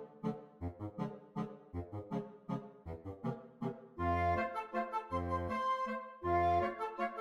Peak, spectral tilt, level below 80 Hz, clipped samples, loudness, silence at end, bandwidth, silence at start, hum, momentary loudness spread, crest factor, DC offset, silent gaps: -20 dBFS; -8 dB/octave; -58 dBFS; under 0.1%; -39 LUFS; 0 s; 12 kHz; 0 s; none; 12 LU; 18 dB; under 0.1%; none